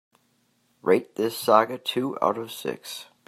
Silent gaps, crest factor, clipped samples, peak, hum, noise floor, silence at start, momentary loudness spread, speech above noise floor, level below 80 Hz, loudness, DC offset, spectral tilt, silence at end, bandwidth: none; 24 dB; under 0.1%; -2 dBFS; none; -68 dBFS; 0.85 s; 12 LU; 43 dB; -74 dBFS; -25 LUFS; under 0.1%; -4.5 dB/octave; 0.25 s; 16 kHz